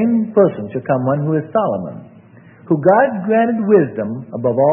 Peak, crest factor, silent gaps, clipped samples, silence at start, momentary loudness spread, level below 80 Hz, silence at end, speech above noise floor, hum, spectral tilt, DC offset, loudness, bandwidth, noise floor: 0 dBFS; 16 dB; none; under 0.1%; 0 s; 11 LU; -60 dBFS; 0 s; 28 dB; none; -12 dB/octave; under 0.1%; -16 LUFS; 3.5 kHz; -43 dBFS